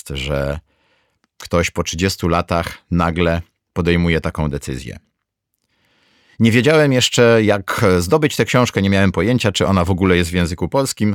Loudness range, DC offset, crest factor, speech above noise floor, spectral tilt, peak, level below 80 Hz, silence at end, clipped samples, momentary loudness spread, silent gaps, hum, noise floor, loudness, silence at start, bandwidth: 6 LU; under 0.1%; 16 dB; 59 dB; -5.5 dB/octave; 0 dBFS; -36 dBFS; 0 s; under 0.1%; 10 LU; none; none; -75 dBFS; -16 LUFS; 0.05 s; 17.5 kHz